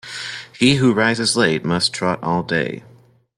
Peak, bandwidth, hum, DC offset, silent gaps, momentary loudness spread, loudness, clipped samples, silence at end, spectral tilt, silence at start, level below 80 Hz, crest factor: -2 dBFS; 12.5 kHz; none; under 0.1%; none; 13 LU; -18 LUFS; under 0.1%; 0.6 s; -4.5 dB/octave; 0.05 s; -54 dBFS; 18 dB